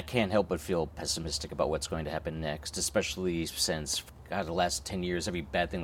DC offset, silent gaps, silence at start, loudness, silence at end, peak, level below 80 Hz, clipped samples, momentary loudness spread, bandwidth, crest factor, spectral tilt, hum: under 0.1%; none; 0 s; -32 LUFS; 0 s; -12 dBFS; -48 dBFS; under 0.1%; 6 LU; 17 kHz; 20 dB; -3.5 dB/octave; none